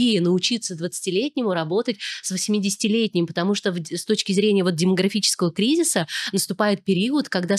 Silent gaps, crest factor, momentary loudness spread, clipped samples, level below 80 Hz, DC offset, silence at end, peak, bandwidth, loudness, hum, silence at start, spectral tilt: none; 16 dB; 6 LU; under 0.1%; -72 dBFS; under 0.1%; 0 s; -6 dBFS; 14.5 kHz; -22 LUFS; none; 0 s; -4 dB/octave